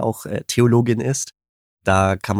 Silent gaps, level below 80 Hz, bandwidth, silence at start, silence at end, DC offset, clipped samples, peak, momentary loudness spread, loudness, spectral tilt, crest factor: 1.49-1.77 s; -48 dBFS; 15.5 kHz; 0 s; 0 s; under 0.1%; under 0.1%; -2 dBFS; 11 LU; -19 LUFS; -5.5 dB/octave; 18 dB